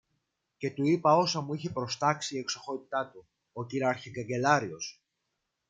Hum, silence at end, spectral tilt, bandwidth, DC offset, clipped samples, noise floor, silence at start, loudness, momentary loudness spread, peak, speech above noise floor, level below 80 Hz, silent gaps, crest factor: none; 0.75 s; -4.5 dB/octave; 9.4 kHz; under 0.1%; under 0.1%; -82 dBFS; 0.6 s; -30 LUFS; 15 LU; -10 dBFS; 53 dB; -72 dBFS; none; 22 dB